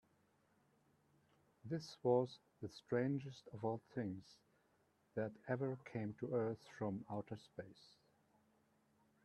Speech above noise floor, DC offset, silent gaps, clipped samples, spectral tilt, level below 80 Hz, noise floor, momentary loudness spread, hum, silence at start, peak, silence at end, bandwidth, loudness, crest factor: 35 dB; under 0.1%; none; under 0.1%; -7.5 dB/octave; -82 dBFS; -78 dBFS; 15 LU; none; 1.65 s; -24 dBFS; 1.5 s; 11.5 kHz; -44 LUFS; 22 dB